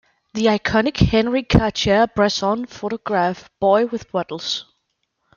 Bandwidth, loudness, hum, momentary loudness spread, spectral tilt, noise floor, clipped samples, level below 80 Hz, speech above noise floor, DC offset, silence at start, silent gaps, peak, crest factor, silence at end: 7.2 kHz; -19 LUFS; none; 9 LU; -5.5 dB/octave; -72 dBFS; under 0.1%; -36 dBFS; 53 dB; under 0.1%; 0.35 s; none; -2 dBFS; 18 dB; 0.75 s